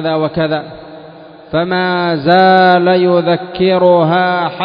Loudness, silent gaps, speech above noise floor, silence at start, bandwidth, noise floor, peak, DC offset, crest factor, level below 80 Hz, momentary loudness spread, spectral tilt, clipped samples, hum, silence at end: -12 LUFS; none; 24 dB; 0 s; 5.2 kHz; -35 dBFS; 0 dBFS; under 0.1%; 12 dB; -50 dBFS; 10 LU; -9 dB/octave; under 0.1%; none; 0 s